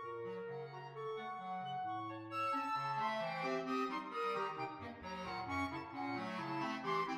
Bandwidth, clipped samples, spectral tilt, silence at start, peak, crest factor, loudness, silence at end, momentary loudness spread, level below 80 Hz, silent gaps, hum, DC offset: 15.5 kHz; under 0.1%; -5.5 dB/octave; 0 s; -26 dBFS; 16 dB; -41 LUFS; 0 s; 8 LU; -74 dBFS; none; none; under 0.1%